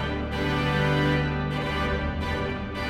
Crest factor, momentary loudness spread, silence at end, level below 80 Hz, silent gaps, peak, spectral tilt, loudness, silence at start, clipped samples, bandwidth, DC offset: 14 dB; 6 LU; 0 s; -36 dBFS; none; -12 dBFS; -6.5 dB/octave; -26 LUFS; 0 s; under 0.1%; 13 kHz; under 0.1%